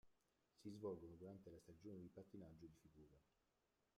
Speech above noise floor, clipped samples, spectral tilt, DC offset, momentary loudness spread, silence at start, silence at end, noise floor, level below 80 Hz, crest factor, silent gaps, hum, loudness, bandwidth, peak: 29 dB; under 0.1%; -7.5 dB/octave; under 0.1%; 11 LU; 0.05 s; 0.75 s; -88 dBFS; -82 dBFS; 20 dB; none; none; -59 LUFS; 13 kHz; -40 dBFS